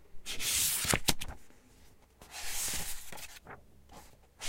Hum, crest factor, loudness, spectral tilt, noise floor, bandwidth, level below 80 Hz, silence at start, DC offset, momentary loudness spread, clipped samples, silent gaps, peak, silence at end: none; 30 dB; -32 LUFS; -1 dB/octave; -60 dBFS; 16 kHz; -50 dBFS; 0 s; under 0.1%; 23 LU; under 0.1%; none; -6 dBFS; 0 s